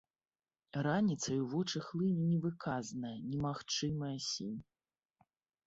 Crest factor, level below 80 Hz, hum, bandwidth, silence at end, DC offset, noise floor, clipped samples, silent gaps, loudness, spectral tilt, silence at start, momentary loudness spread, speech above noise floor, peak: 18 dB; -70 dBFS; none; 8 kHz; 1.05 s; under 0.1%; under -90 dBFS; under 0.1%; none; -37 LUFS; -5.5 dB/octave; 0.75 s; 9 LU; over 54 dB; -20 dBFS